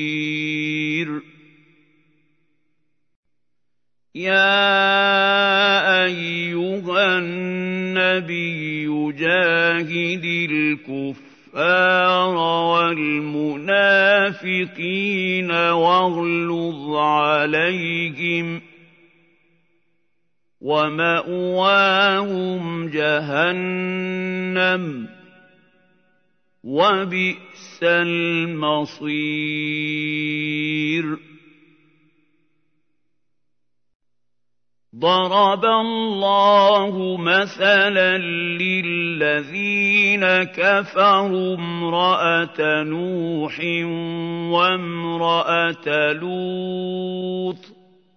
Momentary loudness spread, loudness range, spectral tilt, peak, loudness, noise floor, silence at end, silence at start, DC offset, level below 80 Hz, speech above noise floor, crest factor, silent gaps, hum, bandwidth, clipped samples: 10 LU; 8 LU; -5.5 dB/octave; -2 dBFS; -19 LUFS; -82 dBFS; 0.45 s; 0 s; under 0.1%; -76 dBFS; 63 dB; 18 dB; 3.16-3.23 s, 33.95-34.00 s; none; 6.6 kHz; under 0.1%